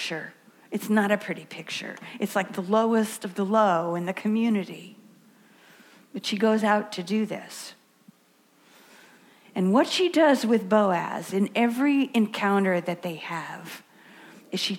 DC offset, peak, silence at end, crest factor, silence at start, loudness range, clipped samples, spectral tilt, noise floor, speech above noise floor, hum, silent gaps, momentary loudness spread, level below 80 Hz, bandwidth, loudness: under 0.1%; -8 dBFS; 0 s; 18 dB; 0 s; 6 LU; under 0.1%; -5 dB/octave; -62 dBFS; 37 dB; none; none; 15 LU; -80 dBFS; 17 kHz; -25 LUFS